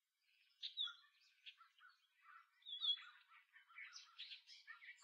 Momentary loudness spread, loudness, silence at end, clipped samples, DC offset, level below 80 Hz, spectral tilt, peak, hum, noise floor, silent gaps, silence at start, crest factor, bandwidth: 25 LU; -48 LUFS; 0 s; under 0.1%; under 0.1%; under -90 dBFS; 11 dB/octave; -32 dBFS; none; -81 dBFS; none; 0.6 s; 22 dB; 8 kHz